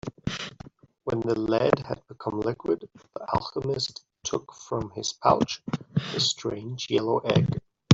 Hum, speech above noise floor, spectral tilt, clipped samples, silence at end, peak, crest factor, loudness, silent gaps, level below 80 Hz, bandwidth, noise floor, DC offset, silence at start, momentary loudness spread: none; 21 dB; -5 dB/octave; under 0.1%; 0 s; -4 dBFS; 24 dB; -28 LUFS; none; -56 dBFS; 8 kHz; -49 dBFS; under 0.1%; 0.05 s; 12 LU